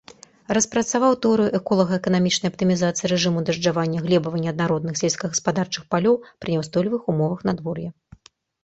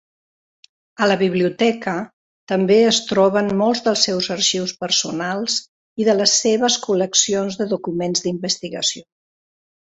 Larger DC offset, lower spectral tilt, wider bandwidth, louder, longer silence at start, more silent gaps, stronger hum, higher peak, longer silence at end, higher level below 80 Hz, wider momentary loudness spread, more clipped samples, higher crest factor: neither; first, -5 dB/octave vs -3 dB/octave; about the same, 8.4 kHz vs 8.2 kHz; second, -22 LUFS vs -18 LUFS; second, 0.5 s vs 1 s; second, none vs 2.13-2.47 s, 5.68-5.96 s; neither; about the same, -4 dBFS vs -2 dBFS; second, 0.75 s vs 0.9 s; first, -56 dBFS vs -62 dBFS; second, 6 LU vs 9 LU; neither; about the same, 18 dB vs 18 dB